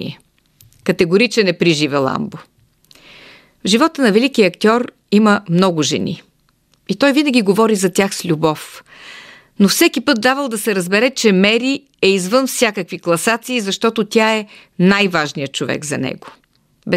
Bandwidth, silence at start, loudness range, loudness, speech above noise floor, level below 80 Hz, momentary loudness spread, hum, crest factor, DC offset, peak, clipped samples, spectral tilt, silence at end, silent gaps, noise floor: 16 kHz; 0 s; 2 LU; -15 LUFS; 43 dB; -58 dBFS; 12 LU; none; 16 dB; under 0.1%; 0 dBFS; under 0.1%; -4.5 dB/octave; 0 s; none; -58 dBFS